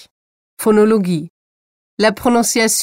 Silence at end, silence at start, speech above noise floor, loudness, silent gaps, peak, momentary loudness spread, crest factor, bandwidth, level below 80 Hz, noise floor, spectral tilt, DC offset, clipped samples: 0 s; 0.6 s; over 76 dB; -15 LUFS; 1.30-1.97 s; -2 dBFS; 9 LU; 14 dB; 16.5 kHz; -52 dBFS; under -90 dBFS; -4 dB/octave; under 0.1%; under 0.1%